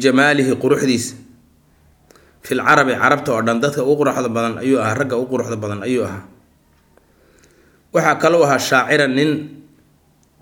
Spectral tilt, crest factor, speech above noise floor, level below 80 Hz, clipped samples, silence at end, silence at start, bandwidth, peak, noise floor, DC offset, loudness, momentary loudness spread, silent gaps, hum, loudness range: -5 dB/octave; 18 dB; 39 dB; -58 dBFS; under 0.1%; 0.8 s; 0 s; 18.5 kHz; 0 dBFS; -56 dBFS; under 0.1%; -16 LUFS; 10 LU; none; none; 6 LU